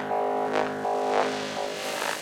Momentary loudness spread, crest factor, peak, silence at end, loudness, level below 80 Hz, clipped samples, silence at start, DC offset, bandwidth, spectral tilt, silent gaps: 5 LU; 18 dB; -10 dBFS; 0 s; -27 LUFS; -70 dBFS; under 0.1%; 0 s; under 0.1%; 17 kHz; -3 dB/octave; none